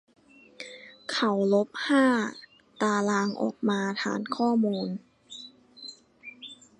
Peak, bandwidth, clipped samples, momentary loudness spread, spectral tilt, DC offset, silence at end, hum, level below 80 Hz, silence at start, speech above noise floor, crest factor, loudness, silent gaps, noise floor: -10 dBFS; 11 kHz; under 0.1%; 20 LU; -5 dB/octave; under 0.1%; 0.25 s; none; -76 dBFS; 0.6 s; 24 dB; 18 dB; -27 LUFS; none; -50 dBFS